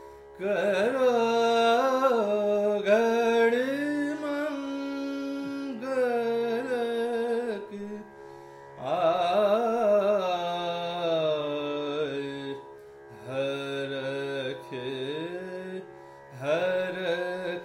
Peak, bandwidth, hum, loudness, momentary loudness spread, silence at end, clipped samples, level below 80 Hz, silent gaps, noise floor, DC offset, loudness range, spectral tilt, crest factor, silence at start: -10 dBFS; 14 kHz; none; -28 LUFS; 16 LU; 0 s; under 0.1%; -70 dBFS; none; -47 dBFS; under 0.1%; 9 LU; -5 dB/octave; 18 dB; 0 s